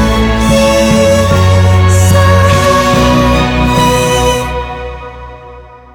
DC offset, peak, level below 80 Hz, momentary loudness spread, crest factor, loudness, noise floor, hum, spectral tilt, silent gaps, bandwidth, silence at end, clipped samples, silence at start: under 0.1%; 0 dBFS; -20 dBFS; 15 LU; 8 dB; -9 LUFS; -32 dBFS; none; -5.5 dB/octave; none; 18 kHz; 0.2 s; under 0.1%; 0 s